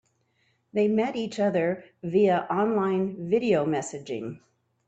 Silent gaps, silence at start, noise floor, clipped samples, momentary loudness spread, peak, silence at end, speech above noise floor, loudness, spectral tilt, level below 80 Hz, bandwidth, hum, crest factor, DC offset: none; 0.75 s; -70 dBFS; under 0.1%; 11 LU; -12 dBFS; 0.5 s; 45 dB; -26 LUFS; -6.5 dB/octave; -70 dBFS; 8.8 kHz; none; 16 dB; under 0.1%